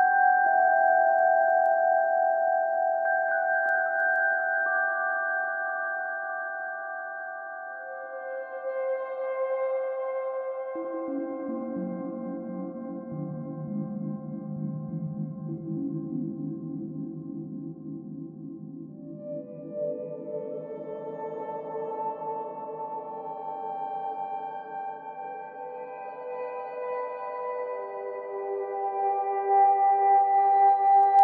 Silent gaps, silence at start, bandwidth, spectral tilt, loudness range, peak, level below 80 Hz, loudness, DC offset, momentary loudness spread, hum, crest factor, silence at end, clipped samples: none; 0 s; 3.3 kHz; -7 dB/octave; 12 LU; -10 dBFS; -78 dBFS; -28 LUFS; under 0.1%; 17 LU; none; 18 dB; 0 s; under 0.1%